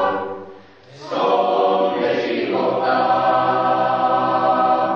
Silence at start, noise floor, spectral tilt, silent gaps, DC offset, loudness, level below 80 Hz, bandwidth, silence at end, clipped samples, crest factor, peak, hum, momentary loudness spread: 0 s; -43 dBFS; -6.5 dB/octave; none; under 0.1%; -18 LUFS; -68 dBFS; 6.8 kHz; 0 s; under 0.1%; 12 dB; -6 dBFS; none; 9 LU